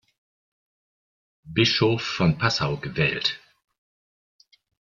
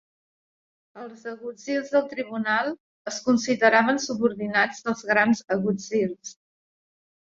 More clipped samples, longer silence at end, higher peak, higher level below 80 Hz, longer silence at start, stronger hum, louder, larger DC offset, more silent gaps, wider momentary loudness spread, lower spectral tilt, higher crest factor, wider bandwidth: neither; first, 1.6 s vs 1.05 s; about the same, -6 dBFS vs -4 dBFS; first, -54 dBFS vs -68 dBFS; first, 1.45 s vs 0.95 s; neither; about the same, -23 LUFS vs -24 LUFS; neither; second, none vs 2.80-3.05 s; second, 8 LU vs 17 LU; about the same, -5 dB/octave vs -4.5 dB/octave; about the same, 22 dB vs 20 dB; about the same, 7.4 kHz vs 7.8 kHz